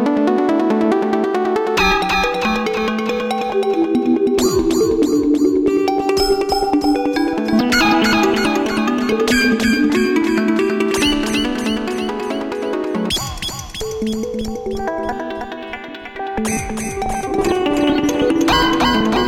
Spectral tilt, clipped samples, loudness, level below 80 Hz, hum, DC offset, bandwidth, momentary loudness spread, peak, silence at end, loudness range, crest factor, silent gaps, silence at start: -4 dB/octave; under 0.1%; -17 LUFS; -36 dBFS; none; under 0.1%; 16.5 kHz; 9 LU; -4 dBFS; 0 s; 7 LU; 12 dB; none; 0 s